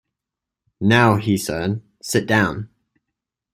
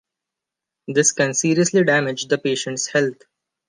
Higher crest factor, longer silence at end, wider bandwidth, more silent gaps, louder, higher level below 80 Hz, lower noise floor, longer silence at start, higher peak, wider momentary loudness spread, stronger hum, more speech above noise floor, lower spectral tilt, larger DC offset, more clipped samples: about the same, 20 dB vs 18 dB; first, 0.85 s vs 0.55 s; first, 16 kHz vs 10 kHz; neither; about the same, -19 LUFS vs -19 LUFS; first, -52 dBFS vs -70 dBFS; about the same, -85 dBFS vs -85 dBFS; about the same, 0.8 s vs 0.9 s; about the same, -2 dBFS vs -4 dBFS; first, 14 LU vs 7 LU; neither; about the same, 67 dB vs 66 dB; first, -5.5 dB/octave vs -3.5 dB/octave; neither; neither